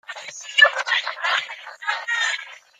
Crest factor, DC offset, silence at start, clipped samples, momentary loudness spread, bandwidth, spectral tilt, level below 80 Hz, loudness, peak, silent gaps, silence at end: 22 dB; under 0.1%; 0.1 s; under 0.1%; 17 LU; 14 kHz; 3.5 dB/octave; -84 dBFS; -20 LUFS; -2 dBFS; none; 0.2 s